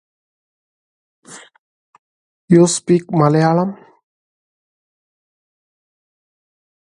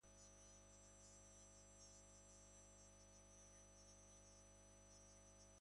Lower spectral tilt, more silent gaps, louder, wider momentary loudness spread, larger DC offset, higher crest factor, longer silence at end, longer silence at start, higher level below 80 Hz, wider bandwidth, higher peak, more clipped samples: first, -6 dB/octave vs -3 dB/octave; first, 1.59-1.93 s, 1.99-2.48 s vs none; first, -14 LUFS vs -65 LUFS; first, 6 LU vs 2 LU; neither; first, 20 dB vs 14 dB; first, 3.1 s vs 0 s; first, 1.3 s vs 0 s; first, -62 dBFS vs -74 dBFS; about the same, 11 kHz vs 11 kHz; first, 0 dBFS vs -54 dBFS; neither